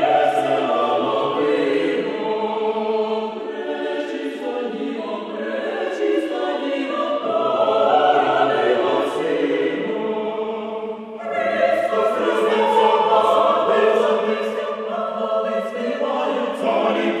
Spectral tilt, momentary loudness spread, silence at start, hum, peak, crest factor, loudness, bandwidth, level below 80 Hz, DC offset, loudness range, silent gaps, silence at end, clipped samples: -5 dB/octave; 10 LU; 0 s; none; -4 dBFS; 16 dB; -20 LUFS; 12 kHz; -70 dBFS; under 0.1%; 7 LU; none; 0 s; under 0.1%